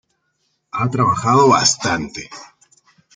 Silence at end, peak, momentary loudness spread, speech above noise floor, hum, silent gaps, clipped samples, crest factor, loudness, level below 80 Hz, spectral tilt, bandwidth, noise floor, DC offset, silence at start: 0.7 s; -2 dBFS; 20 LU; 52 dB; none; none; under 0.1%; 18 dB; -15 LUFS; -52 dBFS; -4 dB/octave; 10 kHz; -68 dBFS; under 0.1%; 0.75 s